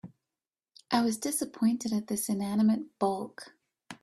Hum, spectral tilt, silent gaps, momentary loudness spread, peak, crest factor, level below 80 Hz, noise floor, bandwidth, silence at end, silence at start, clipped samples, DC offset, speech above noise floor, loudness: none; -4.5 dB/octave; none; 16 LU; -12 dBFS; 20 dB; -72 dBFS; under -90 dBFS; 14 kHz; 0.1 s; 0.05 s; under 0.1%; under 0.1%; over 61 dB; -30 LUFS